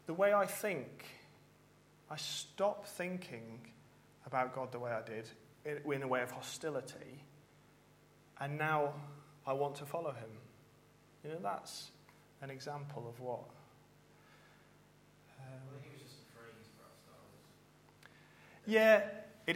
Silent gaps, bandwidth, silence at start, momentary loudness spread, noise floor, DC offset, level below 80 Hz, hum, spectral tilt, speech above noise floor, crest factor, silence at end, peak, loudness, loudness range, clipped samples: none; 16.5 kHz; 0.05 s; 25 LU; -66 dBFS; under 0.1%; -80 dBFS; 50 Hz at -70 dBFS; -4.5 dB/octave; 28 dB; 28 dB; 0 s; -14 dBFS; -38 LUFS; 19 LU; under 0.1%